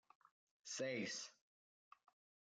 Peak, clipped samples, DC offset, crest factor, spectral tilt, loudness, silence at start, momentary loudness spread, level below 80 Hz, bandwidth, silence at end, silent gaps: -34 dBFS; under 0.1%; under 0.1%; 18 dB; -2.5 dB/octave; -47 LUFS; 0.65 s; 13 LU; under -90 dBFS; 10 kHz; 1.2 s; none